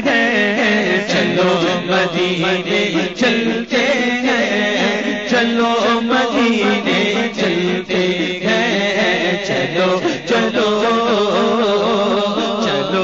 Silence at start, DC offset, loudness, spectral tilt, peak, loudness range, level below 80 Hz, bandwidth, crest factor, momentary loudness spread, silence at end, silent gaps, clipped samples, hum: 0 s; 0.3%; -15 LUFS; -4.5 dB/octave; -2 dBFS; 1 LU; -54 dBFS; 7.8 kHz; 12 dB; 3 LU; 0 s; none; under 0.1%; none